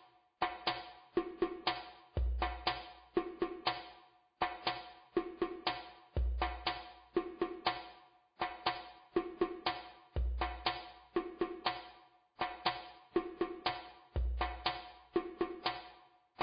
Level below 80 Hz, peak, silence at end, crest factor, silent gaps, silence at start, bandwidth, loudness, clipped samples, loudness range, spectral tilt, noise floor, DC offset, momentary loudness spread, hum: -46 dBFS; -20 dBFS; 0 s; 20 dB; none; 0 s; 5 kHz; -40 LUFS; under 0.1%; 1 LU; -3 dB/octave; -63 dBFS; under 0.1%; 9 LU; none